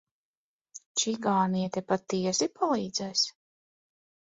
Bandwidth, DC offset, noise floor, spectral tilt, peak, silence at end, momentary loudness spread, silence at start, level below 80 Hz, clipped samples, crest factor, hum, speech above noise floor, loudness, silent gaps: 8 kHz; under 0.1%; under -90 dBFS; -3.5 dB/octave; -12 dBFS; 1 s; 5 LU; 0.75 s; -72 dBFS; under 0.1%; 18 dB; none; over 61 dB; -29 LUFS; 0.86-0.95 s